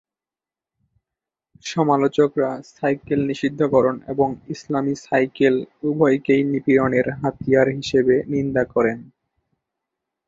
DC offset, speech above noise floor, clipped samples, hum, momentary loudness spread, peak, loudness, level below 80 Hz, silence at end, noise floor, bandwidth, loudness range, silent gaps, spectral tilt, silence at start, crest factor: under 0.1%; over 71 dB; under 0.1%; none; 8 LU; -4 dBFS; -20 LUFS; -54 dBFS; 1.25 s; under -90 dBFS; 7.8 kHz; 3 LU; none; -7 dB/octave; 1.65 s; 18 dB